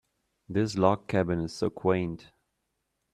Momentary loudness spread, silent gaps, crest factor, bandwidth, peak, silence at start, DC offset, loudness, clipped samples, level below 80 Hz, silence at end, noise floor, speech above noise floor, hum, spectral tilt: 8 LU; none; 24 dB; 11.5 kHz; -6 dBFS; 0.5 s; under 0.1%; -28 LUFS; under 0.1%; -58 dBFS; 0.9 s; -80 dBFS; 52 dB; none; -7 dB/octave